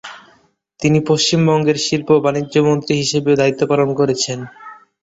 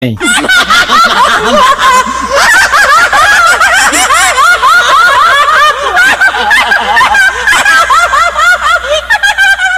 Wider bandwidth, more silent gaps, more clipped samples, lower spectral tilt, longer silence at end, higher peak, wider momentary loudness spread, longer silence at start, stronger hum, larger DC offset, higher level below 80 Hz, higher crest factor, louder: second, 8 kHz vs 16 kHz; neither; second, under 0.1% vs 0.3%; first, -5 dB/octave vs -1 dB/octave; first, 0.3 s vs 0 s; about the same, -2 dBFS vs 0 dBFS; first, 7 LU vs 3 LU; about the same, 0.05 s vs 0 s; neither; neither; second, -54 dBFS vs -34 dBFS; first, 14 dB vs 6 dB; second, -15 LUFS vs -5 LUFS